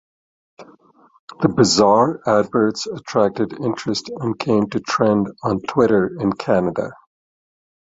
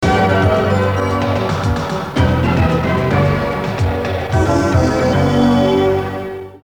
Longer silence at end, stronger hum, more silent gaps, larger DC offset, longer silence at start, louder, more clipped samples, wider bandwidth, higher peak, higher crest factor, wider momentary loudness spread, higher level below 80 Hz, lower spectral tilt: first, 0.9 s vs 0.1 s; neither; first, 1.19-1.28 s vs none; second, under 0.1% vs 0.4%; first, 0.6 s vs 0 s; second, -19 LUFS vs -15 LUFS; neither; second, 8 kHz vs 19 kHz; about the same, -2 dBFS vs -2 dBFS; about the same, 18 dB vs 14 dB; first, 9 LU vs 6 LU; second, -54 dBFS vs -30 dBFS; second, -5.5 dB/octave vs -7 dB/octave